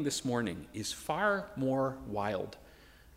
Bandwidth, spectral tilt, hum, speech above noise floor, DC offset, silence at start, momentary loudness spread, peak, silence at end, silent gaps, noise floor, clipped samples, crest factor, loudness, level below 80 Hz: 16 kHz; -4.5 dB/octave; none; 23 dB; under 0.1%; 0 s; 8 LU; -18 dBFS; 0 s; none; -57 dBFS; under 0.1%; 18 dB; -34 LUFS; -60 dBFS